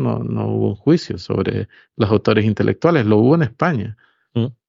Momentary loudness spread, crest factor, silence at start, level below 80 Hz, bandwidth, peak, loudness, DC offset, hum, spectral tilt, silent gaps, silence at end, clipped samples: 11 LU; 16 dB; 0 s; -50 dBFS; 7.6 kHz; -2 dBFS; -18 LUFS; under 0.1%; none; -8.5 dB/octave; none; 0.15 s; under 0.1%